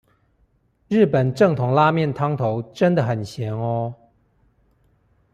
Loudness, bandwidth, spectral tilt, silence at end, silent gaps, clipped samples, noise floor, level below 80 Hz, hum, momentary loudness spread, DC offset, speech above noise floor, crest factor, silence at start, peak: -20 LUFS; 10 kHz; -8 dB/octave; 1.4 s; none; under 0.1%; -63 dBFS; -58 dBFS; none; 9 LU; under 0.1%; 43 dB; 18 dB; 0.9 s; -4 dBFS